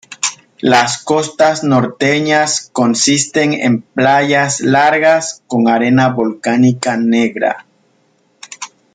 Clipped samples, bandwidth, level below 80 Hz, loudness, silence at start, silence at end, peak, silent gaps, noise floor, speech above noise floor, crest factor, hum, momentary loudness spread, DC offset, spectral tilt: under 0.1%; 9.6 kHz; -58 dBFS; -13 LUFS; 0.1 s; 0.3 s; 0 dBFS; none; -56 dBFS; 44 dB; 14 dB; none; 8 LU; under 0.1%; -4 dB/octave